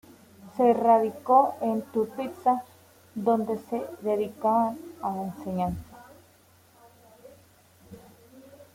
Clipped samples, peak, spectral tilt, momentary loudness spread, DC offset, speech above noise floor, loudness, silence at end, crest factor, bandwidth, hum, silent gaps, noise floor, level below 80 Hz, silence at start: under 0.1%; -8 dBFS; -7.5 dB/octave; 13 LU; under 0.1%; 33 dB; -26 LUFS; 0.1 s; 20 dB; 16.5 kHz; none; none; -58 dBFS; -60 dBFS; 0.45 s